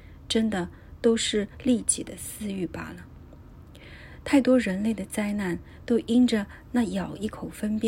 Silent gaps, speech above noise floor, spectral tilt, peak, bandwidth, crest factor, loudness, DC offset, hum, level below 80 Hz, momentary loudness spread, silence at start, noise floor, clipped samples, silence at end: none; 21 dB; -4.5 dB/octave; -8 dBFS; 16 kHz; 18 dB; -26 LUFS; under 0.1%; none; -50 dBFS; 16 LU; 0 s; -47 dBFS; under 0.1%; 0 s